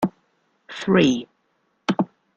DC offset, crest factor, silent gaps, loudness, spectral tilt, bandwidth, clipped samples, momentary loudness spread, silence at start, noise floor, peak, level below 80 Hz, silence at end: under 0.1%; 20 dB; none; -22 LUFS; -6 dB/octave; 8.4 kHz; under 0.1%; 13 LU; 0 s; -69 dBFS; -4 dBFS; -58 dBFS; 0.3 s